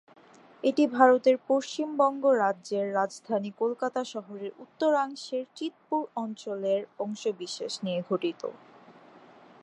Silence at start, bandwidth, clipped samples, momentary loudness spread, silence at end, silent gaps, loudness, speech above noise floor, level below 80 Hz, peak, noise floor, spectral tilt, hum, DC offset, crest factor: 0.65 s; 11 kHz; under 0.1%; 13 LU; 1.05 s; none; -28 LUFS; 26 dB; -86 dBFS; -6 dBFS; -54 dBFS; -5 dB/octave; none; under 0.1%; 24 dB